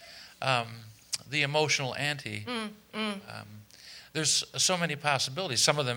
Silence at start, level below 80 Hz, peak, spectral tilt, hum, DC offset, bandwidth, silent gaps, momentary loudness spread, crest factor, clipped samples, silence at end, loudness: 0 s; -70 dBFS; -6 dBFS; -2.5 dB/octave; none; under 0.1%; over 20 kHz; none; 21 LU; 26 dB; under 0.1%; 0 s; -29 LUFS